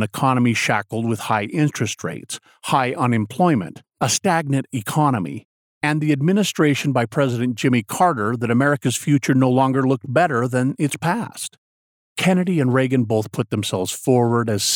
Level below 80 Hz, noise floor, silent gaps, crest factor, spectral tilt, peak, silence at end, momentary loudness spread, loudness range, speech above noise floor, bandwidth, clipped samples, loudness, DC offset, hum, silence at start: -66 dBFS; under -90 dBFS; 5.45-5.81 s, 11.58-12.16 s; 16 dB; -5 dB/octave; -4 dBFS; 0 s; 7 LU; 3 LU; over 71 dB; 18.5 kHz; under 0.1%; -20 LUFS; under 0.1%; none; 0 s